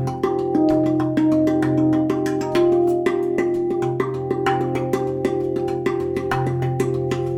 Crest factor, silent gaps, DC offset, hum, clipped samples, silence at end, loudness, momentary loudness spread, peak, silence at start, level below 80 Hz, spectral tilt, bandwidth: 14 dB; none; under 0.1%; none; under 0.1%; 0 s; -20 LUFS; 5 LU; -6 dBFS; 0 s; -52 dBFS; -7.5 dB/octave; 14 kHz